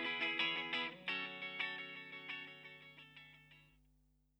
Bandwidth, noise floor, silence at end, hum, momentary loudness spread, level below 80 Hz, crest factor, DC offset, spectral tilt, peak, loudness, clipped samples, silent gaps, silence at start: over 20 kHz; -75 dBFS; 0.7 s; 50 Hz at -70 dBFS; 21 LU; -80 dBFS; 20 dB; under 0.1%; -3.5 dB/octave; -24 dBFS; -41 LUFS; under 0.1%; none; 0 s